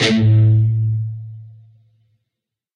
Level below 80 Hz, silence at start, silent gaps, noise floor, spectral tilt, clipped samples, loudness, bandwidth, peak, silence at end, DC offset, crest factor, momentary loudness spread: -48 dBFS; 0 s; none; -82 dBFS; -6.5 dB/octave; under 0.1%; -16 LUFS; 9 kHz; -4 dBFS; 1.25 s; under 0.1%; 14 dB; 19 LU